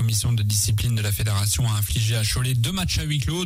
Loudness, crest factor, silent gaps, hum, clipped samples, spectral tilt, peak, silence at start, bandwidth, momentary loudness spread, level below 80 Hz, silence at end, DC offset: -22 LUFS; 12 dB; none; none; under 0.1%; -4 dB/octave; -10 dBFS; 0 s; 16 kHz; 2 LU; -36 dBFS; 0 s; under 0.1%